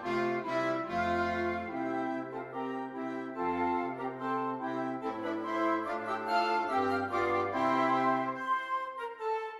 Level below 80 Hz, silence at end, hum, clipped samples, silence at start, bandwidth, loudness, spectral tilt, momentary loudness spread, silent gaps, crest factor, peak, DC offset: -66 dBFS; 0 s; none; under 0.1%; 0 s; 12 kHz; -33 LUFS; -6 dB/octave; 8 LU; none; 16 dB; -18 dBFS; under 0.1%